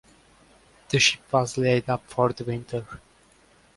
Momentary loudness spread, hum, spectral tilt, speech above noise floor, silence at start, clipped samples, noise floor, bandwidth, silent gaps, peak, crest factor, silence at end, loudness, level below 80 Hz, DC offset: 14 LU; none; -4 dB/octave; 34 dB; 0.9 s; under 0.1%; -58 dBFS; 11.5 kHz; none; -6 dBFS; 22 dB; 0.8 s; -24 LUFS; -56 dBFS; under 0.1%